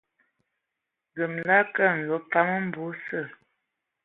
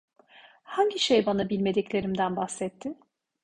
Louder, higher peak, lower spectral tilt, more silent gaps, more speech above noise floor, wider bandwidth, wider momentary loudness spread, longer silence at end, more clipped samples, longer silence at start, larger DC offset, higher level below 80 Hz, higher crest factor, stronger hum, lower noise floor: about the same, -25 LUFS vs -27 LUFS; first, -6 dBFS vs -10 dBFS; first, -9.5 dB/octave vs -4.5 dB/octave; neither; first, 59 dB vs 29 dB; second, 4.1 kHz vs 11 kHz; about the same, 13 LU vs 14 LU; first, 0.7 s vs 0.5 s; neither; first, 1.15 s vs 0.7 s; neither; second, -76 dBFS vs -62 dBFS; about the same, 22 dB vs 20 dB; neither; first, -84 dBFS vs -55 dBFS